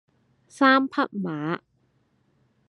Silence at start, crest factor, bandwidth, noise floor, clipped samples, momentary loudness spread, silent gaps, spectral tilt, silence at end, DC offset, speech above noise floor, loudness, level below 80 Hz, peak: 0.55 s; 20 dB; 11 kHz; -67 dBFS; under 0.1%; 12 LU; none; -6 dB/octave; 1.1 s; under 0.1%; 45 dB; -23 LUFS; -80 dBFS; -6 dBFS